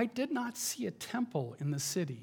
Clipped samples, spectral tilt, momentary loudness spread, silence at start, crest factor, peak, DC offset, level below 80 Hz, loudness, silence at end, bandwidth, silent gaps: under 0.1%; -4.5 dB/octave; 3 LU; 0 s; 18 dB; -18 dBFS; under 0.1%; -80 dBFS; -36 LUFS; 0 s; 19 kHz; none